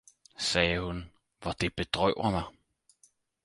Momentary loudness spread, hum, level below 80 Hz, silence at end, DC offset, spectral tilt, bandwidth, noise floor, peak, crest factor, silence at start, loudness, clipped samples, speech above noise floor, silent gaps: 13 LU; none; -48 dBFS; 0.95 s; under 0.1%; -4 dB/octave; 11.5 kHz; -67 dBFS; -8 dBFS; 24 dB; 0.4 s; -30 LUFS; under 0.1%; 37 dB; none